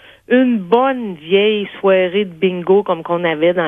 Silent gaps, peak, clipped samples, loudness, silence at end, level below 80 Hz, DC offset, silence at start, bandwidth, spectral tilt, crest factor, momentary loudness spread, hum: none; 0 dBFS; under 0.1%; -15 LUFS; 0 s; -62 dBFS; under 0.1%; 0.3 s; 3.8 kHz; -8 dB/octave; 14 dB; 4 LU; none